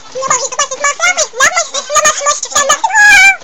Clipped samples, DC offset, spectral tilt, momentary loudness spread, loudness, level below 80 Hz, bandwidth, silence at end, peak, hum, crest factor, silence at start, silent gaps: 0.5%; 2%; 2 dB/octave; 10 LU; -9 LUFS; -44 dBFS; over 20 kHz; 0.05 s; 0 dBFS; none; 10 dB; 0.05 s; none